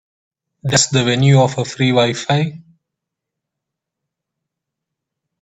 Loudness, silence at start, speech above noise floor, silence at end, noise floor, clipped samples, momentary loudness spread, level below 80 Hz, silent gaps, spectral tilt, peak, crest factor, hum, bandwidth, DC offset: -15 LUFS; 0.65 s; 67 dB; 2.85 s; -81 dBFS; under 0.1%; 6 LU; -56 dBFS; none; -4.5 dB/octave; 0 dBFS; 18 dB; none; 8.4 kHz; under 0.1%